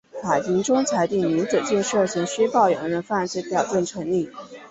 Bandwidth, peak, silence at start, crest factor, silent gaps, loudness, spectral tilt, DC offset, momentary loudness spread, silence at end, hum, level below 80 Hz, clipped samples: 8.2 kHz; -6 dBFS; 0.15 s; 16 dB; none; -22 LUFS; -4.5 dB/octave; under 0.1%; 6 LU; 0 s; none; -62 dBFS; under 0.1%